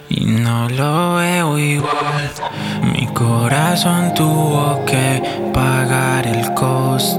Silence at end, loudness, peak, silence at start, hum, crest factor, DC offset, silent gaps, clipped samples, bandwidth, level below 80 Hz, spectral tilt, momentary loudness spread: 0 s; -16 LUFS; -2 dBFS; 0 s; none; 14 dB; under 0.1%; none; under 0.1%; 17.5 kHz; -42 dBFS; -5 dB/octave; 4 LU